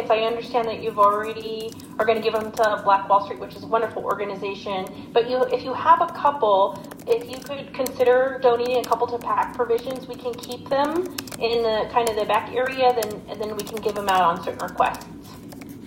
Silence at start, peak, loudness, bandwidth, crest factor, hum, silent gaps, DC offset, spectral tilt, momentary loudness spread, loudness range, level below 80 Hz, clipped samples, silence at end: 0 s; -4 dBFS; -23 LUFS; 16.5 kHz; 18 dB; none; none; under 0.1%; -4 dB/octave; 13 LU; 3 LU; -56 dBFS; under 0.1%; 0 s